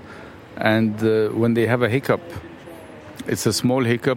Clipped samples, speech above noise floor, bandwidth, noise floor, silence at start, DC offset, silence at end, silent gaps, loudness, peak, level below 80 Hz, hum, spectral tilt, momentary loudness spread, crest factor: under 0.1%; 20 dB; 16.5 kHz; -40 dBFS; 0 s; under 0.1%; 0 s; none; -20 LUFS; -2 dBFS; -58 dBFS; none; -5.5 dB/octave; 20 LU; 18 dB